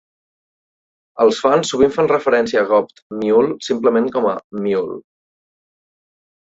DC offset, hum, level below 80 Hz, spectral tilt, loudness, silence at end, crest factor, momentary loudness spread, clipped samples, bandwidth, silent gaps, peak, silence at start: under 0.1%; none; -56 dBFS; -5 dB/octave; -17 LUFS; 1.45 s; 16 dB; 9 LU; under 0.1%; 8 kHz; 3.02-3.10 s, 4.44-4.50 s; -2 dBFS; 1.15 s